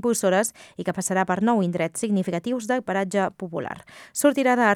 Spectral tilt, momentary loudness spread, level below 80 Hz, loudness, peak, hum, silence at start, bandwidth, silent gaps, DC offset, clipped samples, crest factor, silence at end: -5 dB/octave; 11 LU; -66 dBFS; -24 LUFS; -6 dBFS; none; 0.05 s; 18 kHz; none; under 0.1%; under 0.1%; 18 dB; 0 s